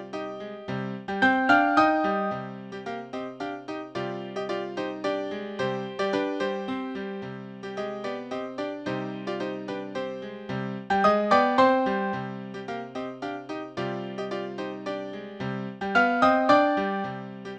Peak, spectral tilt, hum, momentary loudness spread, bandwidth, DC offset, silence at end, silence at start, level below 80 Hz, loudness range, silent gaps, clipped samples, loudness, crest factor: -6 dBFS; -6 dB/octave; none; 15 LU; 9.2 kHz; under 0.1%; 0 s; 0 s; -66 dBFS; 8 LU; none; under 0.1%; -27 LUFS; 22 dB